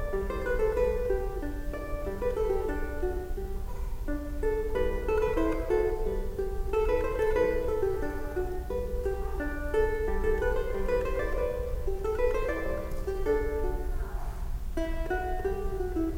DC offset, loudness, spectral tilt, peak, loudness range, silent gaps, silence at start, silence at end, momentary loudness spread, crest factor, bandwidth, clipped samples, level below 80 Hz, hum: under 0.1%; -31 LUFS; -7 dB/octave; -14 dBFS; 4 LU; none; 0 s; 0 s; 9 LU; 14 dB; 16.5 kHz; under 0.1%; -32 dBFS; none